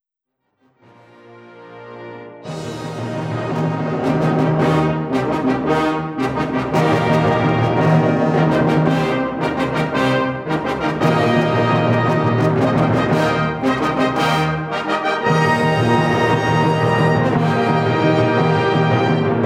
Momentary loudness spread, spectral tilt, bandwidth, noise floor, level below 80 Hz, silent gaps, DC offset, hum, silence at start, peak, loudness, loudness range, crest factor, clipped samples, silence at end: 6 LU; -7 dB/octave; 11.5 kHz; -75 dBFS; -46 dBFS; none; under 0.1%; none; 1.3 s; -4 dBFS; -17 LUFS; 6 LU; 14 dB; under 0.1%; 0 s